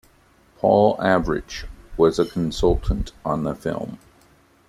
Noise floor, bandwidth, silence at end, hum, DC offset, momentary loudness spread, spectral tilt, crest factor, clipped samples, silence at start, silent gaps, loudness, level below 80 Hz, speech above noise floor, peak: -56 dBFS; 13.5 kHz; 0.7 s; none; under 0.1%; 16 LU; -6.5 dB/octave; 20 dB; under 0.1%; 0.65 s; none; -21 LUFS; -34 dBFS; 35 dB; -2 dBFS